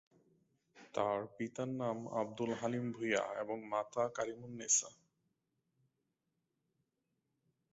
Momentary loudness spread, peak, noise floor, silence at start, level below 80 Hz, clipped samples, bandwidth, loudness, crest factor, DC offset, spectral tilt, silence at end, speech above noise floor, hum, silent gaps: 10 LU; -20 dBFS; -86 dBFS; 0.75 s; -80 dBFS; under 0.1%; 8 kHz; -38 LUFS; 22 dB; under 0.1%; -4.5 dB/octave; 2.8 s; 47 dB; none; none